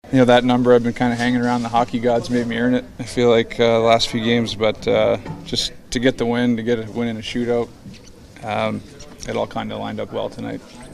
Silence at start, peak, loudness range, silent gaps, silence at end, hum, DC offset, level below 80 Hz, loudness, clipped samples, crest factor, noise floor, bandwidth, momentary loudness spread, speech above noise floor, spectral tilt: 0.05 s; -2 dBFS; 8 LU; none; 0 s; none; under 0.1%; -44 dBFS; -19 LUFS; under 0.1%; 16 dB; -41 dBFS; 12.5 kHz; 12 LU; 22 dB; -5.5 dB/octave